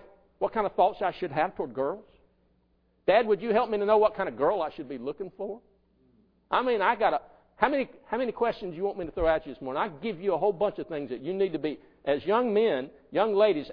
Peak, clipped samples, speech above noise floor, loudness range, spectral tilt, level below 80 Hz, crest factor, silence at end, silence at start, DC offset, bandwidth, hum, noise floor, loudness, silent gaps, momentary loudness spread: -6 dBFS; under 0.1%; 41 dB; 3 LU; -8.5 dB/octave; -54 dBFS; 22 dB; 0 s; 0.4 s; under 0.1%; 5.2 kHz; none; -68 dBFS; -28 LUFS; none; 12 LU